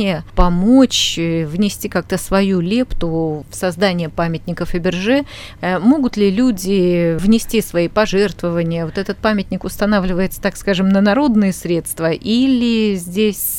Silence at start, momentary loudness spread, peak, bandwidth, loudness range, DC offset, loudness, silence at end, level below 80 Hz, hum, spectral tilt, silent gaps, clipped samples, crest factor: 0 s; 7 LU; 0 dBFS; 17 kHz; 3 LU; under 0.1%; -16 LUFS; 0 s; -30 dBFS; none; -5.5 dB/octave; none; under 0.1%; 16 dB